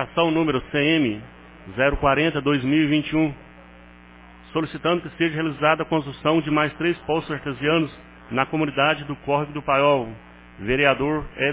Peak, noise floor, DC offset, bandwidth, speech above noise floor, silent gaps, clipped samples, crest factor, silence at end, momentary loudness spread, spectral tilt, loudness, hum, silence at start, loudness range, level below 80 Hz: -4 dBFS; -46 dBFS; under 0.1%; 4 kHz; 25 dB; none; under 0.1%; 20 dB; 0 s; 8 LU; -10 dB/octave; -22 LUFS; 60 Hz at -50 dBFS; 0 s; 3 LU; -44 dBFS